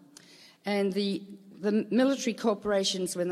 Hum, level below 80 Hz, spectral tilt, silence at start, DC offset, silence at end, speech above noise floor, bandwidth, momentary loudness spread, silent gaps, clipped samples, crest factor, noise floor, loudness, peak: none; -70 dBFS; -4.5 dB/octave; 0.65 s; under 0.1%; 0 s; 26 dB; 15 kHz; 10 LU; none; under 0.1%; 16 dB; -54 dBFS; -29 LUFS; -14 dBFS